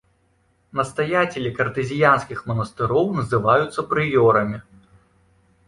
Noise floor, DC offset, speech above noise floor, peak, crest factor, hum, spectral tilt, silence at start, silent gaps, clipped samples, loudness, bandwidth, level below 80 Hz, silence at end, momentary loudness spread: -63 dBFS; under 0.1%; 43 dB; -2 dBFS; 18 dB; none; -6.5 dB/octave; 0.75 s; none; under 0.1%; -20 LUFS; 11.5 kHz; -52 dBFS; 1.05 s; 9 LU